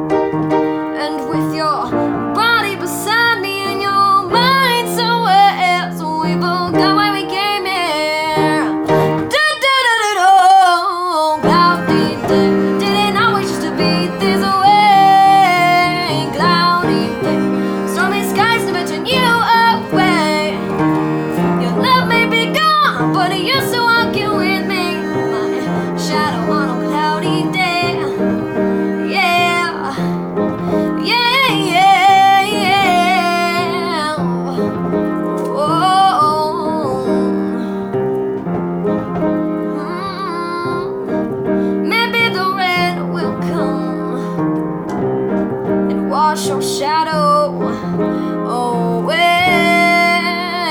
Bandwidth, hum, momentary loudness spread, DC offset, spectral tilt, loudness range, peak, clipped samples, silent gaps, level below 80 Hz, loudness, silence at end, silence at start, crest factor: over 20 kHz; none; 8 LU; under 0.1%; -5 dB/octave; 6 LU; -2 dBFS; under 0.1%; none; -48 dBFS; -14 LUFS; 0 s; 0 s; 14 dB